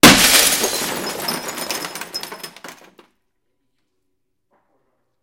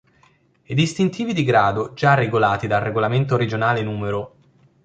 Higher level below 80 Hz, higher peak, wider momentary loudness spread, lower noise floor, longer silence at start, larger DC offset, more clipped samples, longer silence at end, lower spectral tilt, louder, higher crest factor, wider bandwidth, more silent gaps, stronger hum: first, -44 dBFS vs -52 dBFS; about the same, 0 dBFS vs -2 dBFS; first, 23 LU vs 8 LU; first, -75 dBFS vs -58 dBFS; second, 0.05 s vs 0.7 s; neither; first, 0.2% vs under 0.1%; first, 2.5 s vs 0.55 s; second, -1.5 dB/octave vs -6.5 dB/octave; first, -16 LUFS vs -20 LUFS; about the same, 20 dB vs 18 dB; first, 17 kHz vs 9.2 kHz; neither; neither